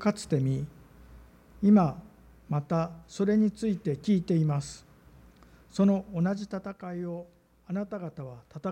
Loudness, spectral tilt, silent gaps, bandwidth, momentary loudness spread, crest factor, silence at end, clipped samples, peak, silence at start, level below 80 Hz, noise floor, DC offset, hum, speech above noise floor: -29 LUFS; -8 dB/octave; none; 10 kHz; 17 LU; 18 dB; 0 s; under 0.1%; -12 dBFS; 0 s; -58 dBFS; -55 dBFS; under 0.1%; none; 28 dB